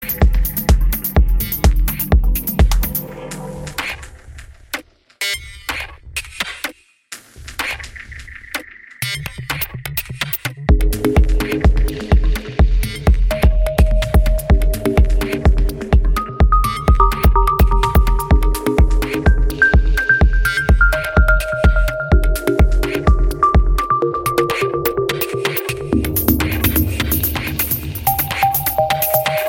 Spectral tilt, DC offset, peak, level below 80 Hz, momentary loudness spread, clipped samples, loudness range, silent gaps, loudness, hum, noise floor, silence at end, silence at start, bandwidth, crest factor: -5.5 dB/octave; under 0.1%; 0 dBFS; -18 dBFS; 12 LU; under 0.1%; 11 LU; none; -17 LUFS; none; -39 dBFS; 0 s; 0 s; 17 kHz; 16 dB